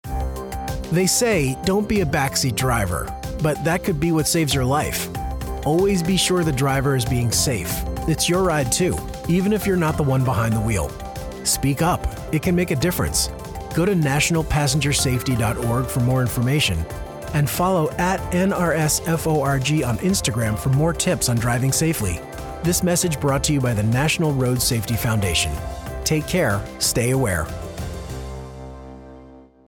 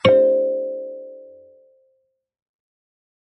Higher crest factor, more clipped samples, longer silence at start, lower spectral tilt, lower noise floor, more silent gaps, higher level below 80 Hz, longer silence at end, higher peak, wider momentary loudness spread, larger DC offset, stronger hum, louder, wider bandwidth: second, 14 dB vs 20 dB; neither; about the same, 0.05 s vs 0.05 s; second, -4.5 dB/octave vs -7 dB/octave; second, -44 dBFS vs -68 dBFS; neither; first, -34 dBFS vs -66 dBFS; second, 0.25 s vs 2.05 s; second, -6 dBFS vs -2 dBFS; second, 10 LU vs 25 LU; neither; neither; about the same, -20 LUFS vs -19 LUFS; first, 19 kHz vs 5.8 kHz